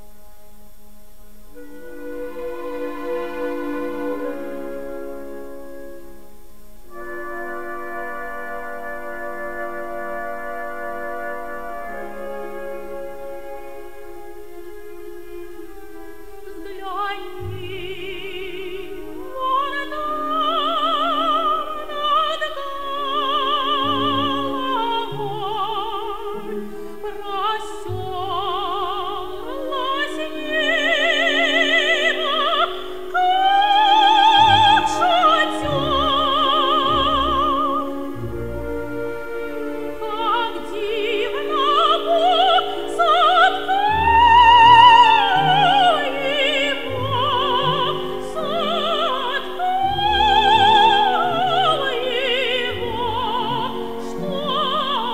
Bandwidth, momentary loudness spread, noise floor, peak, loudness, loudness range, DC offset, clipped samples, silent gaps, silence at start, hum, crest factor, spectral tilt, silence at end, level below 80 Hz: 16 kHz; 19 LU; -48 dBFS; 0 dBFS; -18 LUFS; 19 LU; 2%; under 0.1%; none; 1.55 s; none; 20 dB; -4 dB/octave; 0 s; -44 dBFS